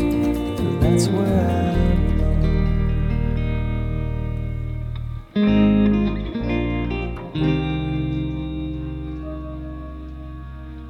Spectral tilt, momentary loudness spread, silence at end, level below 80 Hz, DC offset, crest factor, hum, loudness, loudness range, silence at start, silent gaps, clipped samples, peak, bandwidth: -7.5 dB/octave; 14 LU; 0 s; -26 dBFS; under 0.1%; 16 dB; none; -22 LUFS; 6 LU; 0 s; none; under 0.1%; -6 dBFS; 15 kHz